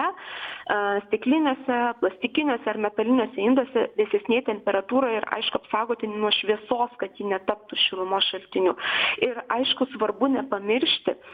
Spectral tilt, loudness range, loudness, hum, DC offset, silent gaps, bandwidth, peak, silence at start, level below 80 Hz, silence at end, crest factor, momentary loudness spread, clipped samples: -6.5 dB/octave; 1 LU; -24 LUFS; none; under 0.1%; none; 5 kHz; -6 dBFS; 0 s; -68 dBFS; 0 s; 20 dB; 5 LU; under 0.1%